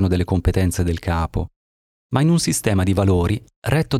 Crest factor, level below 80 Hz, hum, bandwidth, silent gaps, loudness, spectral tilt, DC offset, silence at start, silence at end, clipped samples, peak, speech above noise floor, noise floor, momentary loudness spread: 14 dB; -32 dBFS; none; 14.5 kHz; 1.56-2.10 s, 3.56-3.62 s; -20 LUFS; -6 dB/octave; under 0.1%; 0 s; 0 s; under 0.1%; -4 dBFS; over 71 dB; under -90 dBFS; 8 LU